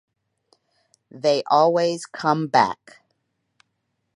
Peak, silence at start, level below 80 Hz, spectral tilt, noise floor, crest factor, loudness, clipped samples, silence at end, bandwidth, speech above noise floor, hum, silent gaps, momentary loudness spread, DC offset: -2 dBFS; 1.15 s; -70 dBFS; -5 dB/octave; -75 dBFS; 22 dB; -20 LUFS; under 0.1%; 1.4 s; 11.5 kHz; 55 dB; none; none; 8 LU; under 0.1%